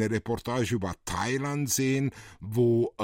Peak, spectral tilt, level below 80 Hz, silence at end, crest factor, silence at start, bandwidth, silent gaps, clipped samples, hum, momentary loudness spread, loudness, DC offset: -14 dBFS; -5 dB/octave; -54 dBFS; 0 s; 14 dB; 0 s; 16.5 kHz; none; under 0.1%; none; 8 LU; -28 LUFS; under 0.1%